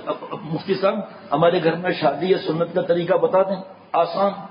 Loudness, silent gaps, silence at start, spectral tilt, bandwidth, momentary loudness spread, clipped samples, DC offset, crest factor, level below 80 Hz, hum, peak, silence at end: -21 LUFS; none; 0 s; -11 dB/octave; 5.4 kHz; 11 LU; under 0.1%; under 0.1%; 16 dB; -66 dBFS; none; -4 dBFS; 0 s